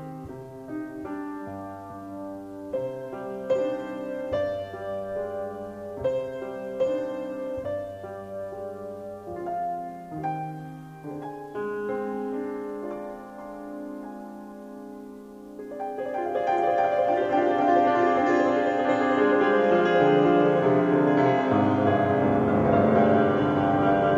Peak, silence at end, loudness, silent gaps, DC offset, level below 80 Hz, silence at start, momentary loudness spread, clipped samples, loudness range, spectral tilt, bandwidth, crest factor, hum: -8 dBFS; 0 s; -25 LUFS; none; under 0.1%; -56 dBFS; 0 s; 18 LU; under 0.1%; 14 LU; -8 dB/octave; 9.2 kHz; 18 dB; none